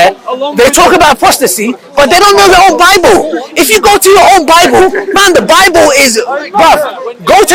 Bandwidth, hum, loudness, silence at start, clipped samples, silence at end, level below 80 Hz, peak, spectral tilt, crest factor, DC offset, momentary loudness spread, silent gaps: over 20 kHz; none; -5 LUFS; 0 s; 10%; 0 s; -32 dBFS; 0 dBFS; -2 dB/octave; 6 dB; under 0.1%; 9 LU; none